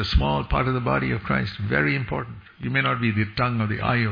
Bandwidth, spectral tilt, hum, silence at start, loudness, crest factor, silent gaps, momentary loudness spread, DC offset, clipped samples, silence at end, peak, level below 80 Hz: 5.2 kHz; -8 dB/octave; none; 0 s; -23 LUFS; 18 dB; none; 5 LU; under 0.1%; under 0.1%; 0 s; -6 dBFS; -34 dBFS